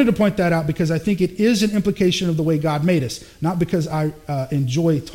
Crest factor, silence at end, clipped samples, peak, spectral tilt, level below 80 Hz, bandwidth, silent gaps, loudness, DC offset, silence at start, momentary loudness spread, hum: 14 dB; 0 s; under 0.1%; -4 dBFS; -6.5 dB/octave; -46 dBFS; 16.5 kHz; none; -20 LUFS; under 0.1%; 0 s; 6 LU; none